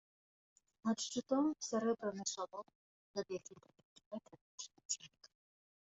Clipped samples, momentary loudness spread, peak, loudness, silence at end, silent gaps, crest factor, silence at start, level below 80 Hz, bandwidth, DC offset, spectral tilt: under 0.1%; 16 LU; -24 dBFS; -41 LUFS; 0.8 s; 2.75-3.14 s, 3.85-3.96 s, 4.06-4.11 s, 4.41-4.58 s, 4.85-4.89 s; 20 dB; 0.85 s; -84 dBFS; 8 kHz; under 0.1%; -4 dB/octave